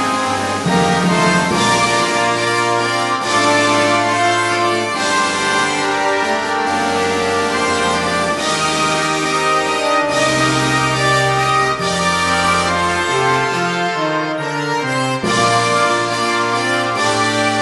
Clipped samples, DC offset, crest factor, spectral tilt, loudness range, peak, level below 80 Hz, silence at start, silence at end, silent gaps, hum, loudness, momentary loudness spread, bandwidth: under 0.1%; under 0.1%; 14 dB; -3.5 dB/octave; 2 LU; 0 dBFS; -46 dBFS; 0 s; 0 s; none; none; -15 LUFS; 4 LU; 12 kHz